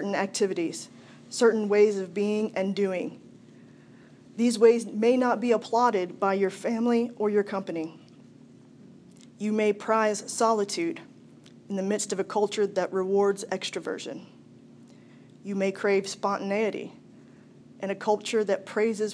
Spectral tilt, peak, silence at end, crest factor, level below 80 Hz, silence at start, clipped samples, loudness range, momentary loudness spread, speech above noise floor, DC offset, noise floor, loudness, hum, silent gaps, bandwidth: -4.5 dB/octave; -8 dBFS; 0 s; 20 dB; -82 dBFS; 0 s; under 0.1%; 6 LU; 13 LU; 26 dB; under 0.1%; -52 dBFS; -26 LUFS; none; none; 11 kHz